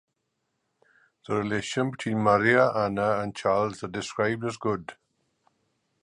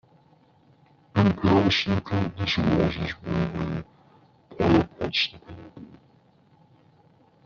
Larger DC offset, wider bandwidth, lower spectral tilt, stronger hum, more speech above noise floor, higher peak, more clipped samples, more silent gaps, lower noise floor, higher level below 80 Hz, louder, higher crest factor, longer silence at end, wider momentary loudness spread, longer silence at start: neither; first, 11 kHz vs 7.2 kHz; about the same, -5.5 dB/octave vs -4.5 dB/octave; neither; first, 53 dB vs 34 dB; about the same, -6 dBFS vs -6 dBFS; neither; neither; first, -78 dBFS vs -59 dBFS; second, -60 dBFS vs -50 dBFS; about the same, -26 LUFS vs -24 LUFS; about the same, 22 dB vs 20 dB; second, 1.1 s vs 1.6 s; second, 11 LU vs 14 LU; first, 1.3 s vs 1.15 s